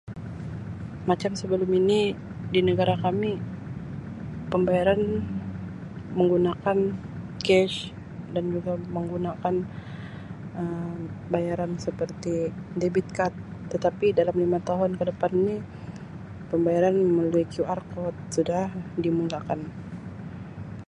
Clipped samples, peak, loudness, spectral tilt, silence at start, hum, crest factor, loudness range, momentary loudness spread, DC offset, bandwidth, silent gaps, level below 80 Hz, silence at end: under 0.1%; -8 dBFS; -26 LUFS; -7 dB/octave; 0.05 s; none; 18 dB; 5 LU; 16 LU; under 0.1%; 11 kHz; none; -52 dBFS; 0.05 s